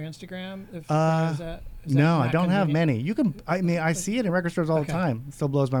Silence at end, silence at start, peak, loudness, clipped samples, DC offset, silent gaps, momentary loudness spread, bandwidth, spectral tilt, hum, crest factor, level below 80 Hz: 0 s; 0 s; -8 dBFS; -24 LUFS; under 0.1%; under 0.1%; none; 14 LU; 13.5 kHz; -6.5 dB/octave; none; 16 dB; -48 dBFS